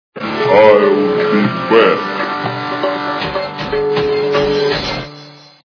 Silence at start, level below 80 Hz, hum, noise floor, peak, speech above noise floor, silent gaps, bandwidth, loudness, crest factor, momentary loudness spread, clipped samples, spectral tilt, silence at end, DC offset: 0.15 s; -44 dBFS; none; -37 dBFS; 0 dBFS; 25 dB; none; 5.4 kHz; -14 LUFS; 14 dB; 11 LU; 0.2%; -6 dB/octave; 0.35 s; under 0.1%